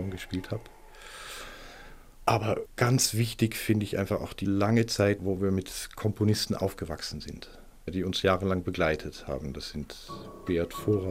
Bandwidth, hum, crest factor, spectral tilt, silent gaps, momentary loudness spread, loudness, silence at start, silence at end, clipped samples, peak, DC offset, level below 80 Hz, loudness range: 16 kHz; none; 22 dB; -5 dB/octave; none; 17 LU; -29 LUFS; 0 s; 0 s; under 0.1%; -8 dBFS; under 0.1%; -50 dBFS; 4 LU